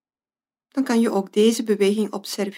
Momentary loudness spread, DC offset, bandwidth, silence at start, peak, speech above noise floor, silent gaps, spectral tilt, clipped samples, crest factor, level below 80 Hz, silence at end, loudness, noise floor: 8 LU; under 0.1%; 16 kHz; 0.75 s; -6 dBFS; over 70 dB; none; -5 dB/octave; under 0.1%; 16 dB; -78 dBFS; 0 s; -21 LUFS; under -90 dBFS